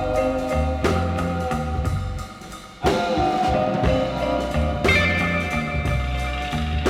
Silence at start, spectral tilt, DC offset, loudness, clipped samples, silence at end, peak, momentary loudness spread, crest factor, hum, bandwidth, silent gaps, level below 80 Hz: 0 s; -6 dB/octave; under 0.1%; -22 LUFS; under 0.1%; 0 s; -6 dBFS; 7 LU; 16 dB; none; 15 kHz; none; -30 dBFS